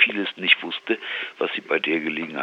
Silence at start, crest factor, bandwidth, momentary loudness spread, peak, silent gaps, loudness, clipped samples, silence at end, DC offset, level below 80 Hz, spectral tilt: 0 s; 22 dB; 8 kHz; 9 LU; -2 dBFS; none; -23 LUFS; under 0.1%; 0 s; under 0.1%; -80 dBFS; -5 dB/octave